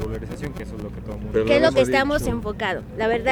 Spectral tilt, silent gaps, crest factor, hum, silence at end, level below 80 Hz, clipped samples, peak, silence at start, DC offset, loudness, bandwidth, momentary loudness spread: -5.5 dB/octave; none; 18 dB; none; 0 s; -36 dBFS; under 0.1%; -4 dBFS; 0 s; under 0.1%; -22 LUFS; 19.5 kHz; 16 LU